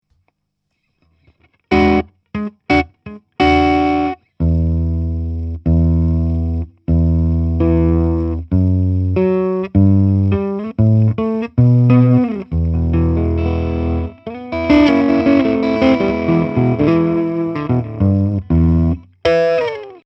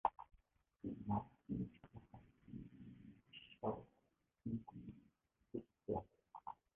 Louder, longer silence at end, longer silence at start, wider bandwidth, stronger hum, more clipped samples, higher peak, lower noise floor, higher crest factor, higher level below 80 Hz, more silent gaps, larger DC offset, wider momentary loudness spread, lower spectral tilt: first, -15 LUFS vs -50 LUFS; about the same, 0.1 s vs 0.2 s; first, 1.7 s vs 0.05 s; first, 6.2 kHz vs 3.7 kHz; neither; neither; first, 0 dBFS vs -20 dBFS; second, -71 dBFS vs -83 dBFS; second, 14 dB vs 30 dB; first, -26 dBFS vs -68 dBFS; neither; neither; second, 9 LU vs 18 LU; first, -9.5 dB/octave vs -6.5 dB/octave